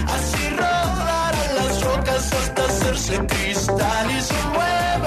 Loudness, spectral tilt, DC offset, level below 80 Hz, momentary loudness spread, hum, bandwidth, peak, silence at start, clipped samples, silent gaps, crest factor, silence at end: -21 LUFS; -4 dB/octave; under 0.1%; -30 dBFS; 1 LU; none; 14 kHz; -8 dBFS; 0 s; under 0.1%; none; 14 dB; 0 s